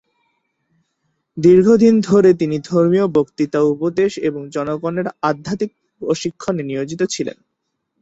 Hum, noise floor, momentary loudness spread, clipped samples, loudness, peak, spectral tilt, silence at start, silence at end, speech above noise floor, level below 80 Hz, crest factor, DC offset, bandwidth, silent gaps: none; -74 dBFS; 13 LU; under 0.1%; -17 LUFS; -2 dBFS; -6.5 dB/octave; 1.35 s; 0.7 s; 58 dB; -56 dBFS; 16 dB; under 0.1%; 8 kHz; none